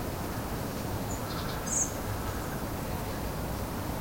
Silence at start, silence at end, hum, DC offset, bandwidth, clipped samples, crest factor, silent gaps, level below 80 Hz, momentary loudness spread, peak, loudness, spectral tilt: 0 s; 0 s; none; under 0.1%; 16.5 kHz; under 0.1%; 16 dB; none; -42 dBFS; 6 LU; -18 dBFS; -34 LUFS; -4 dB/octave